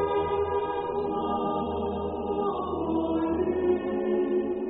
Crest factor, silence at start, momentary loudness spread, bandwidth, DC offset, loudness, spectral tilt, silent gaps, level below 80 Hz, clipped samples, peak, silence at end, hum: 12 dB; 0 s; 4 LU; 4 kHz; under 0.1%; -28 LUFS; -6 dB/octave; none; -50 dBFS; under 0.1%; -14 dBFS; 0 s; none